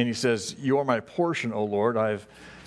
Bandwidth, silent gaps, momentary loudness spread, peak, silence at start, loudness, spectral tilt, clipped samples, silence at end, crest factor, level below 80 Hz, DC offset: 11 kHz; none; 4 LU; -8 dBFS; 0 s; -26 LUFS; -5 dB/octave; under 0.1%; 0 s; 18 dB; -66 dBFS; under 0.1%